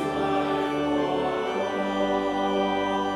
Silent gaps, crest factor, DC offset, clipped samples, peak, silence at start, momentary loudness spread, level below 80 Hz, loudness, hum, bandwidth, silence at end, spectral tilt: none; 12 dB; under 0.1%; under 0.1%; -12 dBFS; 0 s; 2 LU; -54 dBFS; -26 LUFS; none; 12.5 kHz; 0 s; -5.5 dB/octave